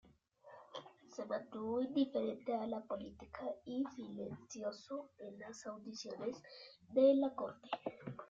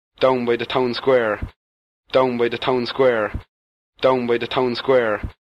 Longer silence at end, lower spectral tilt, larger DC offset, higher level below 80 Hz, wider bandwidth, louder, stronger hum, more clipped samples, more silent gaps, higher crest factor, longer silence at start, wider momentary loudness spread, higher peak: second, 0.05 s vs 0.2 s; second, -5 dB/octave vs -6.5 dB/octave; neither; second, -78 dBFS vs -42 dBFS; about the same, 7.6 kHz vs 8 kHz; second, -41 LUFS vs -20 LUFS; neither; neither; second, none vs 1.56-2.03 s, 3.48-3.93 s; about the same, 20 dB vs 16 dB; first, 0.45 s vs 0.2 s; first, 18 LU vs 7 LU; second, -20 dBFS vs -4 dBFS